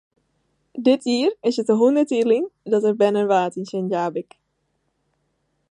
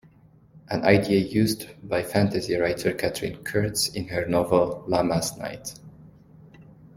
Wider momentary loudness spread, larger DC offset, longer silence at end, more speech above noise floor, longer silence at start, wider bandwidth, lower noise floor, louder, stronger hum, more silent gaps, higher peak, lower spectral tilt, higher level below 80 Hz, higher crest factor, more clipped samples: second, 9 LU vs 12 LU; neither; first, 1.5 s vs 0.1 s; first, 52 dB vs 30 dB; first, 0.75 s vs 0.55 s; second, 10.5 kHz vs 16.5 kHz; first, -71 dBFS vs -54 dBFS; first, -20 LUFS vs -24 LUFS; neither; neither; about the same, -6 dBFS vs -4 dBFS; about the same, -6 dB/octave vs -5 dB/octave; second, -74 dBFS vs -52 dBFS; second, 16 dB vs 22 dB; neither